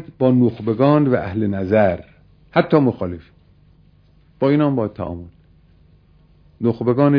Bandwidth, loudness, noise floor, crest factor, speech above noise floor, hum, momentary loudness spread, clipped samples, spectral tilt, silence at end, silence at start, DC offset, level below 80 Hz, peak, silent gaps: 5.4 kHz; -18 LUFS; -52 dBFS; 20 dB; 35 dB; 50 Hz at -45 dBFS; 13 LU; under 0.1%; -11 dB/octave; 0 s; 0 s; under 0.1%; -50 dBFS; 0 dBFS; none